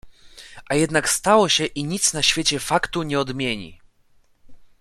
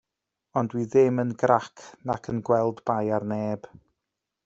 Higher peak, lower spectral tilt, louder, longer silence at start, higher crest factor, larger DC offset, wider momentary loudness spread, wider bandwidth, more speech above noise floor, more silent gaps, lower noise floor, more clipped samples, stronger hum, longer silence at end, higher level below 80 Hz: first, -2 dBFS vs -6 dBFS; second, -2.5 dB/octave vs -7.5 dB/octave; first, -20 LUFS vs -25 LUFS; second, 0.05 s vs 0.55 s; about the same, 20 dB vs 22 dB; neither; about the same, 9 LU vs 11 LU; first, 15.5 kHz vs 7.8 kHz; second, 36 dB vs 60 dB; neither; second, -57 dBFS vs -85 dBFS; neither; neither; second, 0.15 s vs 0.85 s; first, -48 dBFS vs -64 dBFS